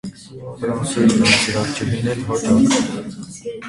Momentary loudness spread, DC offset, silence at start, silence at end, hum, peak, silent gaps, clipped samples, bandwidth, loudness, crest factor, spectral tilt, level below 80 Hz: 18 LU; under 0.1%; 0.05 s; 0 s; none; 0 dBFS; none; under 0.1%; 11.5 kHz; -17 LUFS; 18 dB; -4.5 dB/octave; -46 dBFS